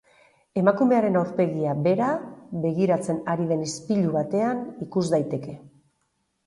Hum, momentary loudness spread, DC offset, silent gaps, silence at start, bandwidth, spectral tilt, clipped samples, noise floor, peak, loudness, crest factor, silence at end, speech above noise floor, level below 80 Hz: none; 11 LU; under 0.1%; none; 0.55 s; 11.5 kHz; -7 dB/octave; under 0.1%; -73 dBFS; -6 dBFS; -24 LUFS; 20 dB; 0.8 s; 50 dB; -64 dBFS